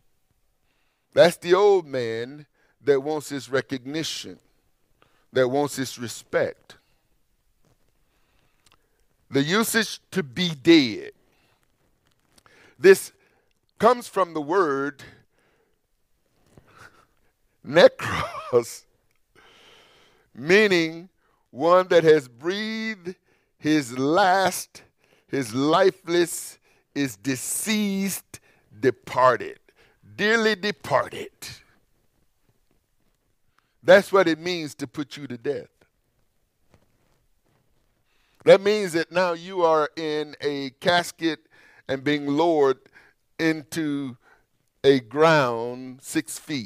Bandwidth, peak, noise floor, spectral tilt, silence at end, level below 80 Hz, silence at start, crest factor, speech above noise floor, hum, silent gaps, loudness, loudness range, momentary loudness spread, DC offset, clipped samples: 16 kHz; -2 dBFS; -69 dBFS; -4.5 dB/octave; 0 s; -64 dBFS; 1.15 s; 22 dB; 47 dB; none; none; -22 LUFS; 7 LU; 16 LU; under 0.1%; under 0.1%